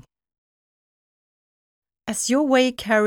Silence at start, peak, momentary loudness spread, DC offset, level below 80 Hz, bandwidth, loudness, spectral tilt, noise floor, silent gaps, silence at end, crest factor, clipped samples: 2.05 s; -6 dBFS; 12 LU; under 0.1%; -60 dBFS; 18.5 kHz; -20 LUFS; -3 dB/octave; under -90 dBFS; none; 0 s; 18 dB; under 0.1%